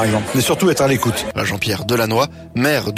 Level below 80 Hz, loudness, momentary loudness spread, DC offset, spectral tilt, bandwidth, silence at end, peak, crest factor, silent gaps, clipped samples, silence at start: -44 dBFS; -17 LUFS; 5 LU; under 0.1%; -4.5 dB/octave; 16 kHz; 0 s; -4 dBFS; 12 dB; none; under 0.1%; 0 s